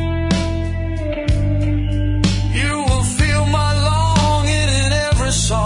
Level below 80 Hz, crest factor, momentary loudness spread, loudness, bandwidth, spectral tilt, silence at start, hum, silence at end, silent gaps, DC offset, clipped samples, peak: -22 dBFS; 14 dB; 6 LU; -17 LUFS; 11 kHz; -5 dB/octave; 0 s; none; 0 s; none; under 0.1%; under 0.1%; -2 dBFS